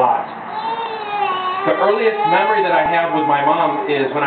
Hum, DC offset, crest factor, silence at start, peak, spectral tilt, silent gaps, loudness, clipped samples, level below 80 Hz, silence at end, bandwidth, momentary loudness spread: none; under 0.1%; 14 dB; 0 s; -2 dBFS; -8.5 dB/octave; none; -17 LUFS; under 0.1%; -60 dBFS; 0 s; 4.6 kHz; 8 LU